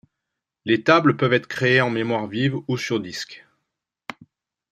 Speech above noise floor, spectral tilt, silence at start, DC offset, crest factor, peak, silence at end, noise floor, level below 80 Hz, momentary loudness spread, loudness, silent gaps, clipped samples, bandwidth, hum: 62 dB; -6 dB/octave; 0.65 s; under 0.1%; 22 dB; -2 dBFS; 1.35 s; -83 dBFS; -64 dBFS; 21 LU; -20 LUFS; none; under 0.1%; 13.5 kHz; none